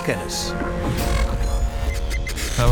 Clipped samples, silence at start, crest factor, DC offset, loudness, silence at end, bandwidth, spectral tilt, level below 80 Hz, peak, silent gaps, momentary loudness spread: under 0.1%; 0 s; 18 dB; under 0.1%; -24 LUFS; 0 s; 19 kHz; -4.5 dB/octave; -24 dBFS; -4 dBFS; none; 4 LU